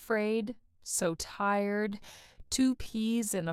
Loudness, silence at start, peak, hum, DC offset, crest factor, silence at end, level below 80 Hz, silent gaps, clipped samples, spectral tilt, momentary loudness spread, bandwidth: -32 LUFS; 0 s; -16 dBFS; none; under 0.1%; 16 dB; 0 s; -56 dBFS; none; under 0.1%; -4 dB/octave; 12 LU; 16.5 kHz